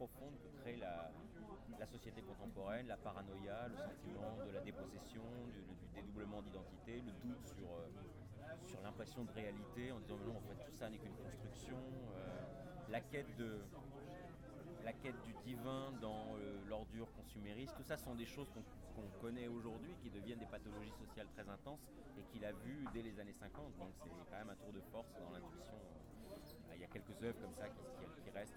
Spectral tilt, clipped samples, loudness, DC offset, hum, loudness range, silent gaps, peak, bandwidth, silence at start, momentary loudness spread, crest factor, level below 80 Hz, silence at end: -6 dB/octave; under 0.1%; -52 LUFS; under 0.1%; none; 3 LU; none; -32 dBFS; over 20 kHz; 0 s; 8 LU; 20 dB; -64 dBFS; 0 s